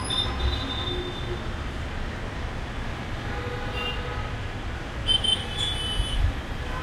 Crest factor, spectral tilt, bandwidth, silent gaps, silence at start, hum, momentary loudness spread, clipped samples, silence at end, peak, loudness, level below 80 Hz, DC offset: 18 dB; -4 dB/octave; 13 kHz; none; 0 s; none; 10 LU; under 0.1%; 0 s; -10 dBFS; -28 LUFS; -32 dBFS; under 0.1%